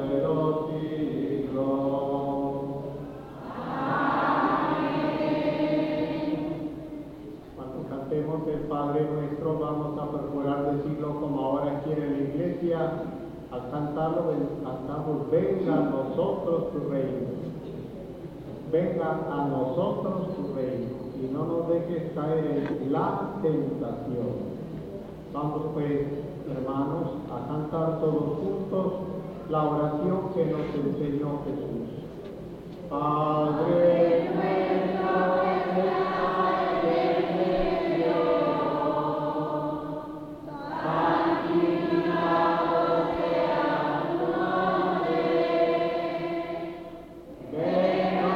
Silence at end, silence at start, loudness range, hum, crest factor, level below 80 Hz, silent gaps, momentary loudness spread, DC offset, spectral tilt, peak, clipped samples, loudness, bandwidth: 0 s; 0 s; 5 LU; none; 16 dB; -54 dBFS; none; 13 LU; under 0.1%; -8.5 dB/octave; -12 dBFS; under 0.1%; -27 LUFS; 7.8 kHz